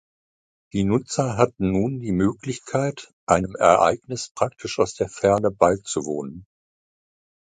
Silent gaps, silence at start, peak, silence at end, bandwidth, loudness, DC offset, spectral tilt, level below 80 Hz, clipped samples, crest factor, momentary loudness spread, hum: 3.13-3.27 s, 4.31-4.35 s; 0.75 s; -2 dBFS; 1.15 s; 9.6 kHz; -22 LUFS; under 0.1%; -5.5 dB/octave; -48 dBFS; under 0.1%; 22 dB; 12 LU; none